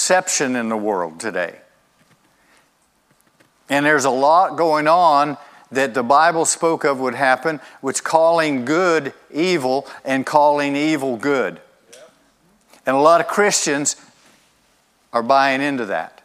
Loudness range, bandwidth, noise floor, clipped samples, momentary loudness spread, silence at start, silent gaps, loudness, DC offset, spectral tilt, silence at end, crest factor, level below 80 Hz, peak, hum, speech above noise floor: 6 LU; 16 kHz; -61 dBFS; under 0.1%; 11 LU; 0 s; none; -18 LUFS; under 0.1%; -3 dB/octave; 0.15 s; 18 dB; -72 dBFS; 0 dBFS; none; 43 dB